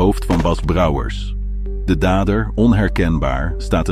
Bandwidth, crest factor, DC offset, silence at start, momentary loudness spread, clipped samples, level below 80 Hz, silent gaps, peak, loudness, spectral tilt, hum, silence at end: 14 kHz; 14 dB; under 0.1%; 0 s; 10 LU; under 0.1%; -22 dBFS; none; -2 dBFS; -18 LUFS; -7 dB/octave; 50 Hz at -25 dBFS; 0 s